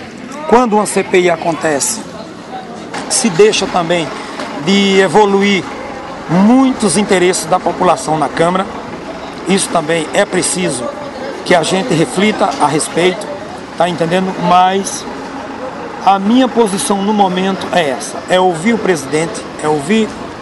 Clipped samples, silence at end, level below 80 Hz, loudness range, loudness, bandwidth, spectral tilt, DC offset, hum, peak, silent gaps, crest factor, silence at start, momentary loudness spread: under 0.1%; 0 s; -46 dBFS; 3 LU; -13 LUFS; 12 kHz; -4 dB/octave; under 0.1%; none; 0 dBFS; none; 14 dB; 0 s; 14 LU